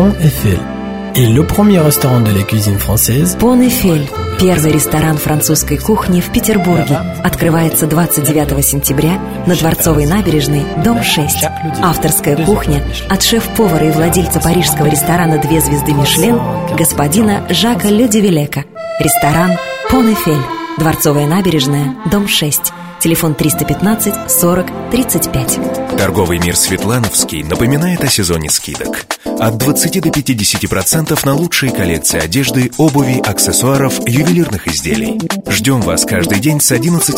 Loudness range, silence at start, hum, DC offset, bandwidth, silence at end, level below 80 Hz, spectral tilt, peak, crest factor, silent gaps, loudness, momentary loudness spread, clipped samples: 2 LU; 0 s; none; under 0.1%; 16.5 kHz; 0 s; -30 dBFS; -4.5 dB/octave; 0 dBFS; 12 dB; none; -12 LUFS; 5 LU; under 0.1%